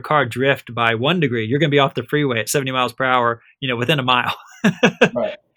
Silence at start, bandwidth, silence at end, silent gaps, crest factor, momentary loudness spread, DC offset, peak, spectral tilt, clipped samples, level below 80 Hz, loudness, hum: 0.05 s; over 20 kHz; 0.2 s; none; 18 dB; 6 LU; under 0.1%; 0 dBFS; -5 dB/octave; under 0.1%; -60 dBFS; -18 LUFS; none